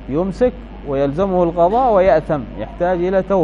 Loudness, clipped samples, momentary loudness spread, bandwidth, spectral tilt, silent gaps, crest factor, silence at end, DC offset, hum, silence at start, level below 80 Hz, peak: -17 LUFS; under 0.1%; 10 LU; 7.6 kHz; -8.5 dB/octave; none; 14 dB; 0 s; under 0.1%; none; 0 s; -34 dBFS; -2 dBFS